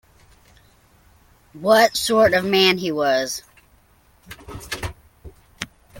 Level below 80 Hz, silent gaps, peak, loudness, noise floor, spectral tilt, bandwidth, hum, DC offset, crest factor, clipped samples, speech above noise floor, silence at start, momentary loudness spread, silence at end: -48 dBFS; none; -2 dBFS; -18 LUFS; -56 dBFS; -3.5 dB/octave; 17 kHz; none; under 0.1%; 20 dB; under 0.1%; 38 dB; 1.55 s; 19 LU; 0 s